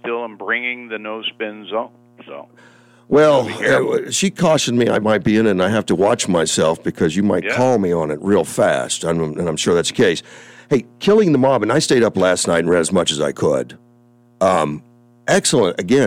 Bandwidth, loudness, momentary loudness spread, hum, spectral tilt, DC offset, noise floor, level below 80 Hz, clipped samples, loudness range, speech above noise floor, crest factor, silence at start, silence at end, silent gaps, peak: 16 kHz; -17 LUFS; 11 LU; none; -4.5 dB/octave; under 0.1%; -51 dBFS; -52 dBFS; under 0.1%; 3 LU; 35 dB; 14 dB; 0.05 s; 0 s; none; -4 dBFS